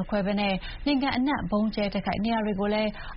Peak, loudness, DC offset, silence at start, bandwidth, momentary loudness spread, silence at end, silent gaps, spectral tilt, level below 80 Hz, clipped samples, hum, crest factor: -12 dBFS; -27 LUFS; under 0.1%; 0 s; 5.8 kHz; 3 LU; 0 s; none; -4.5 dB/octave; -42 dBFS; under 0.1%; none; 16 dB